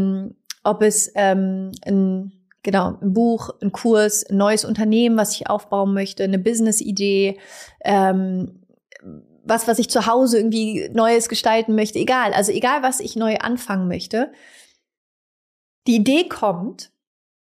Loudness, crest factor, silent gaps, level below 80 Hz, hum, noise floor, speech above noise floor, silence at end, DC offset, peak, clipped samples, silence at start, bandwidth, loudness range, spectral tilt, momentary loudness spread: -19 LUFS; 14 dB; 14.97-15.82 s; -60 dBFS; none; -46 dBFS; 27 dB; 0.65 s; under 0.1%; -6 dBFS; under 0.1%; 0 s; 15.5 kHz; 5 LU; -4.5 dB/octave; 11 LU